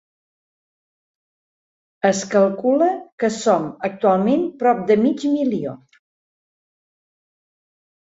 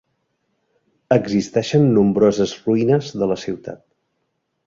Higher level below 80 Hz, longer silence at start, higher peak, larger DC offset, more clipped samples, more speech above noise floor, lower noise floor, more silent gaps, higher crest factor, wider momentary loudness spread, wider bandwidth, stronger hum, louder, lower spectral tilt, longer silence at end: second, -66 dBFS vs -54 dBFS; first, 2.05 s vs 1.1 s; about the same, -2 dBFS vs -2 dBFS; neither; neither; first, over 72 dB vs 55 dB; first, under -90 dBFS vs -72 dBFS; first, 3.12-3.18 s vs none; about the same, 18 dB vs 18 dB; second, 6 LU vs 11 LU; about the same, 8 kHz vs 7.6 kHz; neither; about the same, -19 LUFS vs -18 LUFS; second, -5.5 dB/octave vs -7 dB/octave; first, 2.25 s vs 0.9 s